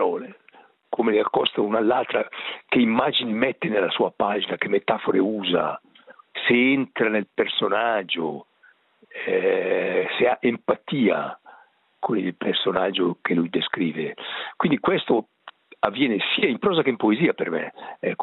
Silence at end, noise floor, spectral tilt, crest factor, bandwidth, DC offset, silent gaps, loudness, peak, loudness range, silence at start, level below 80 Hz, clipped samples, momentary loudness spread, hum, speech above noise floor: 0 s; -58 dBFS; -9 dB/octave; 22 dB; 4.2 kHz; under 0.1%; none; -23 LUFS; -2 dBFS; 2 LU; 0 s; -66 dBFS; under 0.1%; 10 LU; none; 36 dB